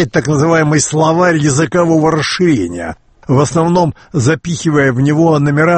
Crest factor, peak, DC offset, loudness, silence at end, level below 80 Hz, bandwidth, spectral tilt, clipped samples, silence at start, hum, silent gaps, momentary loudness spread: 12 dB; 0 dBFS; under 0.1%; -12 LUFS; 0 s; -42 dBFS; 8.8 kHz; -5.5 dB/octave; under 0.1%; 0 s; none; none; 5 LU